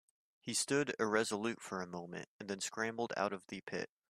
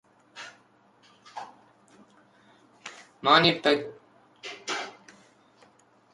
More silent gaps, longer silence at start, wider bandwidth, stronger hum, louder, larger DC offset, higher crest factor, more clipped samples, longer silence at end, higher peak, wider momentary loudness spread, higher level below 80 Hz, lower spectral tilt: first, 2.27-2.39 s vs none; about the same, 0.45 s vs 0.35 s; first, 15.5 kHz vs 11.5 kHz; neither; second, -38 LUFS vs -24 LUFS; neither; second, 22 dB vs 28 dB; neither; second, 0.25 s vs 1.25 s; second, -18 dBFS vs -4 dBFS; second, 12 LU vs 26 LU; second, -80 dBFS vs -70 dBFS; about the same, -3 dB/octave vs -4 dB/octave